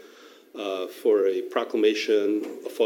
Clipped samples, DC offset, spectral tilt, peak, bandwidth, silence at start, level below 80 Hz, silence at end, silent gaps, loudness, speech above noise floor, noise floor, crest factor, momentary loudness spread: under 0.1%; under 0.1%; -3.5 dB/octave; -10 dBFS; 17 kHz; 0.2 s; -90 dBFS; 0 s; none; -25 LUFS; 26 dB; -50 dBFS; 16 dB; 12 LU